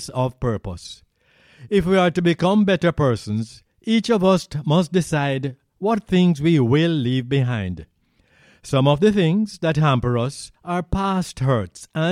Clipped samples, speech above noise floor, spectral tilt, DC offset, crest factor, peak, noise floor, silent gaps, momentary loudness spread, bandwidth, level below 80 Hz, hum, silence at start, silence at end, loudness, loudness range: under 0.1%; 40 dB; -6.5 dB/octave; under 0.1%; 16 dB; -4 dBFS; -59 dBFS; none; 11 LU; 12.5 kHz; -44 dBFS; none; 0 s; 0 s; -20 LUFS; 2 LU